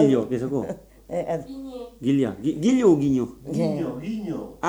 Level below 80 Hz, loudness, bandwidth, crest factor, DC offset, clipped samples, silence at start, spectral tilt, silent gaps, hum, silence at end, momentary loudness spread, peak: -52 dBFS; -24 LUFS; 11.5 kHz; 18 dB; under 0.1%; under 0.1%; 0 s; -7.5 dB/octave; none; none; 0 s; 15 LU; -6 dBFS